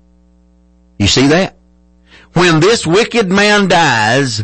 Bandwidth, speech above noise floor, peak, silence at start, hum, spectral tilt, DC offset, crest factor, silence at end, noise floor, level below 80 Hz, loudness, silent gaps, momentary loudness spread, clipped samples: 8.8 kHz; 38 dB; 0 dBFS; 1 s; none; -4.5 dB/octave; under 0.1%; 12 dB; 0 s; -48 dBFS; -38 dBFS; -10 LUFS; none; 5 LU; under 0.1%